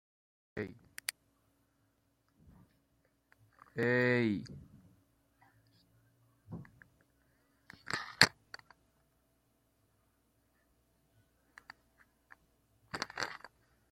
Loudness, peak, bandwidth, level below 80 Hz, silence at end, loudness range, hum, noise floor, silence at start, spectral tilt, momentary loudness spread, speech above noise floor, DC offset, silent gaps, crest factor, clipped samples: -34 LUFS; -2 dBFS; 16.5 kHz; -72 dBFS; 0.45 s; 14 LU; none; -76 dBFS; 0.55 s; -3.5 dB/octave; 26 LU; 43 dB; under 0.1%; none; 38 dB; under 0.1%